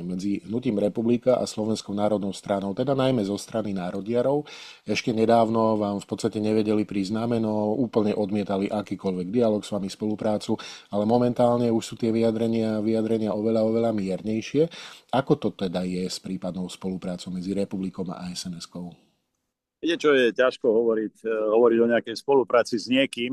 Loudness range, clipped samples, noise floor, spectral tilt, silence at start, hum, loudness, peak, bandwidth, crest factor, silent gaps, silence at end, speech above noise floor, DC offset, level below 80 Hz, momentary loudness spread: 6 LU; under 0.1%; -81 dBFS; -6 dB/octave; 0 s; none; -25 LUFS; -6 dBFS; 13 kHz; 18 dB; none; 0 s; 56 dB; under 0.1%; -62 dBFS; 11 LU